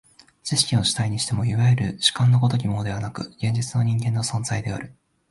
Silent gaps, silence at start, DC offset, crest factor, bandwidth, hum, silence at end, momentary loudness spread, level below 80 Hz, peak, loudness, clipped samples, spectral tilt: none; 0.45 s; under 0.1%; 20 dB; 11.5 kHz; none; 0.4 s; 11 LU; -48 dBFS; -2 dBFS; -22 LUFS; under 0.1%; -4.5 dB/octave